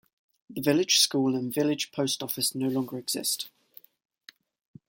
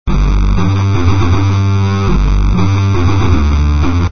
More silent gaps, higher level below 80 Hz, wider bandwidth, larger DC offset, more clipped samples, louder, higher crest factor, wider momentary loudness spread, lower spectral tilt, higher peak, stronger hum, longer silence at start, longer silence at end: neither; second, -72 dBFS vs -14 dBFS; first, 17 kHz vs 6.6 kHz; second, under 0.1% vs 9%; neither; second, -26 LUFS vs -12 LUFS; first, 20 dB vs 10 dB; first, 10 LU vs 1 LU; second, -3 dB/octave vs -7 dB/octave; second, -8 dBFS vs 0 dBFS; neither; first, 0.5 s vs 0.05 s; first, 1.4 s vs 0 s